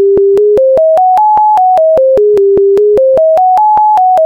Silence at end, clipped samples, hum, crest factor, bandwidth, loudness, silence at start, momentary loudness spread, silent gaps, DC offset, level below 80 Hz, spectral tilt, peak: 0 s; under 0.1%; none; 4 dB; 7.4 kHz; -7 LUFS; 0 s; 0 LU; none; 0.1%; -42 dBFS; -7.5 dB/octave; -2 dBFS